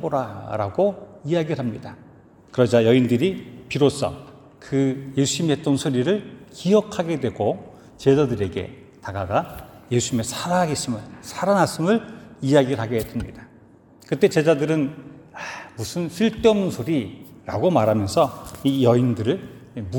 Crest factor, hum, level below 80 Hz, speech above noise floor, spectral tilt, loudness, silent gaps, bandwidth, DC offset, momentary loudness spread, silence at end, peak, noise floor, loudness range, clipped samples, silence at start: 18 dB; none; -52 dBFS; 29 dB; -6 dB/octave; -22 LUFS; none; 18 kHz; under 0.1%; 17 LU; 0 s; -4 dBFS; -50 dBFS; 3 LU; under 0.1%; 0 s